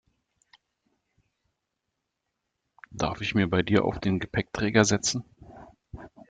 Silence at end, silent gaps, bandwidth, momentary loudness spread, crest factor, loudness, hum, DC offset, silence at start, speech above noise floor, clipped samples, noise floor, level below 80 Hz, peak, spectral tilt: 0.2 s; none; 9.4 kHz; 24 LU; 26 dB; -26 LUFS; none; under 0.1%; 2.9 s; 57 dB; under 0.1%; -82 dBFS; -54 dBFS; -4 dBFS; -4.5 dB/octave